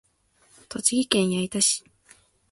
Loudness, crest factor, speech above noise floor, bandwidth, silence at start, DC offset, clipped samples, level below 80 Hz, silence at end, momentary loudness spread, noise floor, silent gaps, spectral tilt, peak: -23 LUFS; 24 dB; 39 dB; 12 kHz; 0.7 s; under 0.1%; under 0.1%; -64 dBFS; 0.7 s; 7 LU; -63 dBFS; none; -3 dB/octave; -2 dBFS